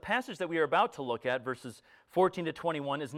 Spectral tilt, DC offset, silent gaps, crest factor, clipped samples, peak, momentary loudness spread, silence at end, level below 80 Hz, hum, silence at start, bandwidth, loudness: -5.5 dB/octave; under 0.1%; none; 18 dB; under 0.1%; -14 dBFS; 9 LU; 0 s; -70 dBFS; none; 0.05 s; 14.5 kHz; -32 LUFS